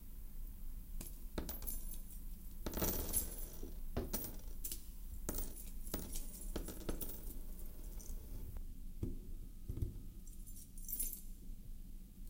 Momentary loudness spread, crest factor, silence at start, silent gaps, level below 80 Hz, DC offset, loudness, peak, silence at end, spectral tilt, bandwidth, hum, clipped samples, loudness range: 15 LU; 22 dB; 0 s; none; -46 dBFS; under 0.1%; -46 LUFS; -22 dBFS; 0 s; -4 dB/octave; 17 kHz; none; under 0.1%; 7 LU